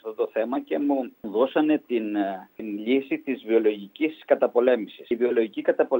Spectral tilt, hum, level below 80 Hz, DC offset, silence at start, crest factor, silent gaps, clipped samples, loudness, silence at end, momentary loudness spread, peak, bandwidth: -8 dB/octave; none; -76 dBFS; under 0.1%; 0.05 s; 20 dB; none; under 0.1%; -25 LUFS; 0 s; 8 LU; -6 dBFS; 16 kHz